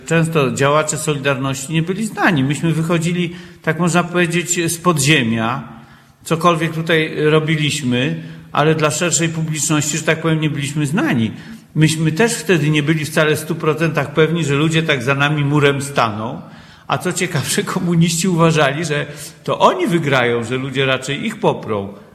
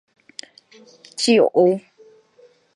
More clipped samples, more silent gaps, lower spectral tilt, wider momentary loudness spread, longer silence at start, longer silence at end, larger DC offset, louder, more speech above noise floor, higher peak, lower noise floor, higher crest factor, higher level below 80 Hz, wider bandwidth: neither; neither; about the same, -4.5 dB/octave vs -4.5 dB/octave; second, 8 LU vs 23 LU; second, 0 s vs 1.2 s; second, 0.1 s vs 0.95 s; neither; about the same, -16 LUFS vs -17 LUFS; second, 26 dB vs 36 dB; first, 0 dBFS vs -4 dBFS; second, -42 dBFS vs -54 dBFS; about the same, 16 dB vs 18 dB; first, -52 dBFS vs -76 dBFS; first, 14.5 kHz vs 11.5 kHz